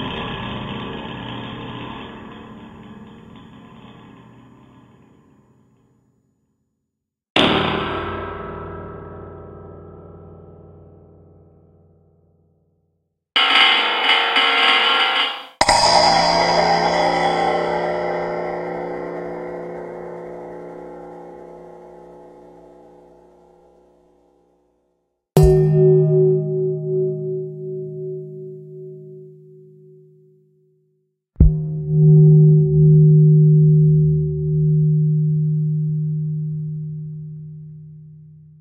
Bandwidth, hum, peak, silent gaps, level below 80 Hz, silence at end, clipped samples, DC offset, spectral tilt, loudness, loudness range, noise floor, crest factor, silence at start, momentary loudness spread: 9.6 kHz; none; 0 dBFS; 7.30-7.35 s; -36 dBFS; 0.55 s; under 0.1%; under 0.1%; -6 dB/octave; -16 LUFS; 21 LU; -79 dBFS; 20 dB; 0 s; 25 LU